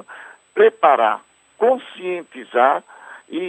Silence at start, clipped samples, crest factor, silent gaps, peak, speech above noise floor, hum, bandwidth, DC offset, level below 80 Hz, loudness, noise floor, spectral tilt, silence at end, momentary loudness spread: 0.1 s; under 0.1%; 18 dB; none; -2 dBFS; 24 dB; none; 8.4 kHz; under 0.1%; -78 dBFS; -18 LUFS; -41 dBFS; -5 dB/octave; 0 s; 15 LU